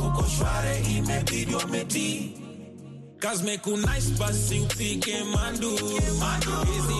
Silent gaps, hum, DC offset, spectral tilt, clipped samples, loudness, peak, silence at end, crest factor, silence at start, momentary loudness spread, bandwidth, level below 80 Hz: none; none; under 0.1%; -4 dB/octave; under 0.1%; -26 LUFS; -12 dBFS; 0 s; 14 dB; 0 s; 10 LU; 12.5 kHz; -34 dBFS